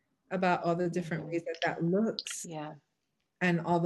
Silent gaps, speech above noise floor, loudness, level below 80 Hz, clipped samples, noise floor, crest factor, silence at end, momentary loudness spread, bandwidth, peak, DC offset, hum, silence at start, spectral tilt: none; 50 dB; -32 LUFS; -74 dBFS; under 0.1%; -82 dBFS; 18 dB; 0 s; 10 LU; 12.5 kHz; -14 dBFS; under 0.1%; none; 0.3 s; -5.5 dB/octave